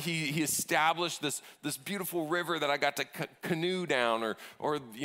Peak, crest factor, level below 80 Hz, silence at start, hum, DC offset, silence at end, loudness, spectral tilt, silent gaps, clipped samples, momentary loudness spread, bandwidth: -12 dBFS; 20 dB; -78 dBFS; 0 s; none; under 0.1%; 0 s; -32 LUFS; -3 dB/octave; none; under 0.1%; 9 LU; 16 kHz